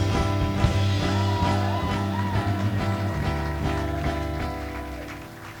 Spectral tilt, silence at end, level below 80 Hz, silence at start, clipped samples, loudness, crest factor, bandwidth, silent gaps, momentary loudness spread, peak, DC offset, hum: -6.5 dB/octave; 0 s; -34 dBFS; 0 s; under 0.1%; -26 LUFS; 16 dB; 18.5 kHz; none; 11 LU; -8 dBFS; under 0.1%; none